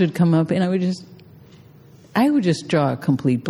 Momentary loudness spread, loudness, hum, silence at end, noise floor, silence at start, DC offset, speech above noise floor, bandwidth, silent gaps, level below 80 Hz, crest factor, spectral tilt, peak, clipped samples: 7 LU; -20 LUFS; none; 0 s; -47 dBFS; 0 s; under 0.1%; 28 dB; 14 kHz; none; -60 dBFS; 14 dB; -7.5 dB/octave; -6 dBFS; under 0.1%